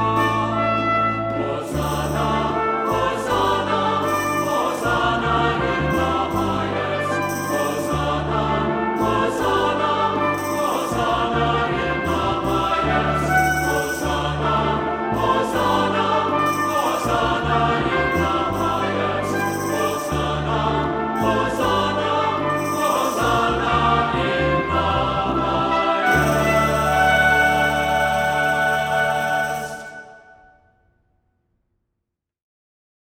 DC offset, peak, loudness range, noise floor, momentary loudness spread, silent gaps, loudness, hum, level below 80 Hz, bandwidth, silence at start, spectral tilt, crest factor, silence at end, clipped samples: under 0.1%; -4 dBFS; 4 LU; -80 dBFS; 5 LU; none; -20 LUFS; none; -38 dBFS; 17.5 kHz; 0 s; -5 dB/octave; 16 dB; 2.95 s; under 0.1%